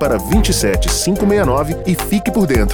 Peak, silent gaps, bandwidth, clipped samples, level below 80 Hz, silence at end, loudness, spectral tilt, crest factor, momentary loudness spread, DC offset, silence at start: -2 dBFS; none; over 20 kHz; under 0.1%; -22 dBFS; 0 s; -15 LUFS; -5 dB/octave; 14 dB; 4 LU; under 0.1%; 0 s